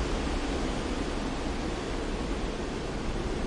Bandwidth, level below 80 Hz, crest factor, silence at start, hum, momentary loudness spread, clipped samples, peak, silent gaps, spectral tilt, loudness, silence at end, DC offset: 11.5 kHz; -36 dBFS; 12 dB; 0 s; none; 3 LU; under 0.1%; -18 dBFS; none; -5 dB/octave; -33 LUFS; 0 s; under 0.1%